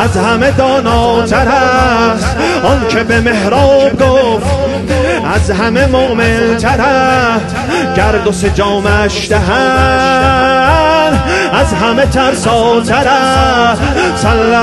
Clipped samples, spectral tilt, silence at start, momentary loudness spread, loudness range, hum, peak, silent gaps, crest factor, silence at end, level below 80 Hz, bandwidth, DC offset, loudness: under 0.1%; -5 dB/octave; 0 s; 4 LU; 1 LU; none; 0 dBFS; none; 10 dB; 0 s; -22 dBFS; 12.5 kHz; 0.1%; -10 LUFS